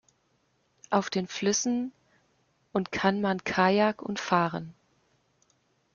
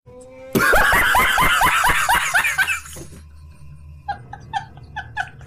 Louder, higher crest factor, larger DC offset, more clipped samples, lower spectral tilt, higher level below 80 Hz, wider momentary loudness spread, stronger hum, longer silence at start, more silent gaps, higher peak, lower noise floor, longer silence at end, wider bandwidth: second, -28 LUFS vs -16 LUFS; first, 22 dB vs 14 dB; neither; neither; first, -4.5 dB/octave vs -2 dB/octave; second, -66 dBFS vs -34 dBFS; second, 10 LU vs 20 LU; neither; first, 0.9 s vs 0.15 s; neither; about the same, -8 dBFS vs -6 dBFS; first, -71 dBFS vs -41 dBFS; first, 1.25 s vs 0 s; second, 7.4 kHz vs 15.5 kHz